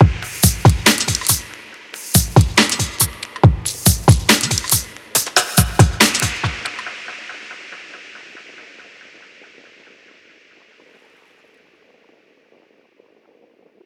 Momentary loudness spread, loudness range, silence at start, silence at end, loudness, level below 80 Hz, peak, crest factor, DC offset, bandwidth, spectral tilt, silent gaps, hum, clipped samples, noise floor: 22 LU; 19 LU; 0 s; 5.25 s; -15 LUFS; -30 dBFS; 0 dBFS; 18 dB; under 0.1%; 19 kHz; -3.5 dB/octave; none; none; under 0.1%; -55 dBFS